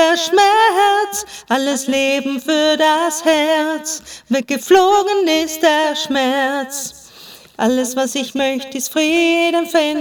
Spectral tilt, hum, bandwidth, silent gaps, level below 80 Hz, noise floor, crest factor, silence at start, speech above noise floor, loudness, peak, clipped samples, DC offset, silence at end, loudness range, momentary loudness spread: -1.5 dB/octave; none; over 20 kHz; none; -58 dBFS; -40 dBFS; 14 dB; 0 s; 25 dB; -15 LUFS; 0 dBFS; under 0.1%; under 0.1%; 0 s; 3 LU; 10 LU